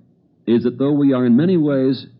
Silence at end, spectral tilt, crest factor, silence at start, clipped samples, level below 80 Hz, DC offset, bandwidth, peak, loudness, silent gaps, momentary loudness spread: 0.15 s; -12 dB/octave; 10 dB; 0.45 s; under 0.1%; -70 dBFS; under 0.1%; 5.4 kHz; -6 dBFS; -16 LUFS; none; 5 LU